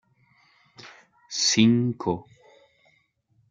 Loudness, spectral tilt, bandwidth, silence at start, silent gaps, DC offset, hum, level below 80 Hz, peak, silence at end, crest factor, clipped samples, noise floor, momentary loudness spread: -23 LUFS; -4 dB/octave; 9.2 kHz; 0.85 s; none; under 0.1%; none; -66 dBFS; -6 dBFS; 1.3 s; 22 dB; under 0.1%; -67 dBFS; 24 LU